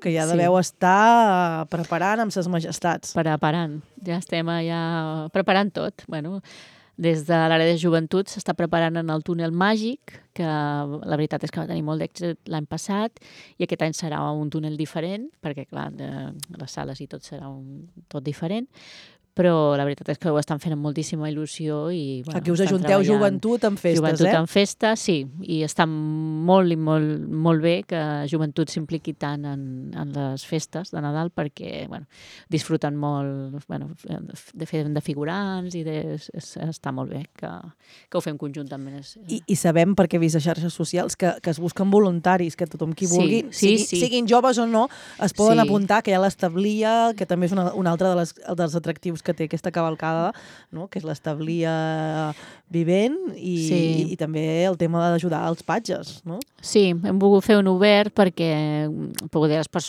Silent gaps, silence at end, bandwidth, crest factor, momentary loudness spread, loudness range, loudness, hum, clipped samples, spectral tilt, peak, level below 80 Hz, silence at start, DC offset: none; 0 s; 14.5 kHz; 20 dB; 15 LU; 10 LU; -23 LUFS; none; under 0.1%; -5.5 dB/octave; -2 dBFS; -62 dBFS; 0 s; under 0.1%